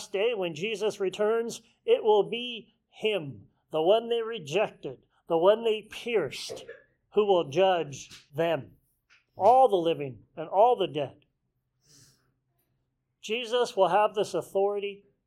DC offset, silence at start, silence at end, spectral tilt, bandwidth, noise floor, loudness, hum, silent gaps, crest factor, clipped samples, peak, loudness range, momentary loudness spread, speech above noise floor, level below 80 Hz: under 0.1%; 0 s; 0.3 s; -4.5 dB/octave; 14 kHz; -78 dBFS; -27 LUFS; none; none; 20 dB; under 0.1%; -8 dBFS; 5 LU; 15 LU; 51 dB; -72 dBFS